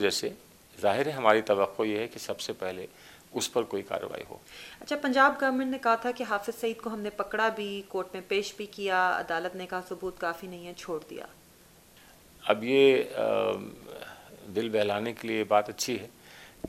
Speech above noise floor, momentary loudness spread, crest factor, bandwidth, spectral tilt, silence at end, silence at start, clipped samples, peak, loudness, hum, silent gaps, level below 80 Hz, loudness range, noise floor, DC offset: 28 dB; 20 LU; 24 dB; 15.5 kHz; -3.5 dB/octave; 0 s; 0 s; under 0.1%; -6 dBFS; -29 LUFS; none; none; -68 dBFS; 5 LU; -57 dBFS; under 0.1%